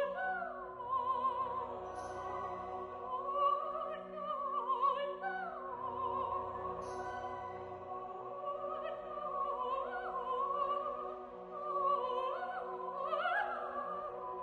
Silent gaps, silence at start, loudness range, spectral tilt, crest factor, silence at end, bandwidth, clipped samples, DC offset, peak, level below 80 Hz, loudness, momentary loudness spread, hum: none; 0 s; 4 LU; -5 dB/octave; 16 dB; 0 s; 11 kHz; under 0.1%; under 0.1%; -22 dBFS; -70 dBFS; -39 LUFS; 10 LU; none